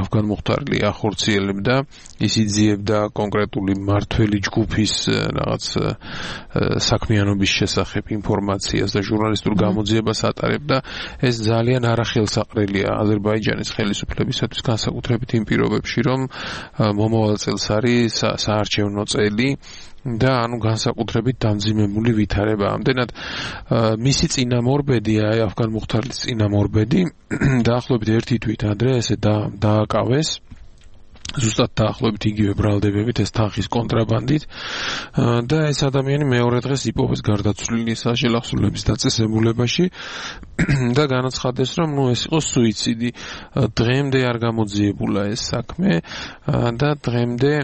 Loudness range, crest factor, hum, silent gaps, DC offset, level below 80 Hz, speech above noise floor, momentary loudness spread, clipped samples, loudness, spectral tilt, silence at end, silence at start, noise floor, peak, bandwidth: 1 LU; 18 dB; none; none; under 0.1%; -38 dBFS; 22 dB; 5 LU; under 0.1%; -20 LUFS; -5.5 dB/octave; 0 s; 0 s; -42 dBFS; -2 dBFS; 8.8 kHz